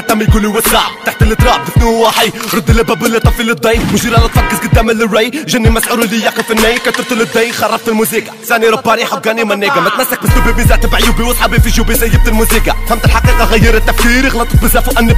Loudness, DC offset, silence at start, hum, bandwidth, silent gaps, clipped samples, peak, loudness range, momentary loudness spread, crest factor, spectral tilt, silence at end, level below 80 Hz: -10 LUFS; under 0.1%; 0 s; none; 16 kHz; none; 0.3%; 0 dBFS; 1 LU; 3 LU; 10 dB; -4.5 dB/octave; 0 s; -14 dBFS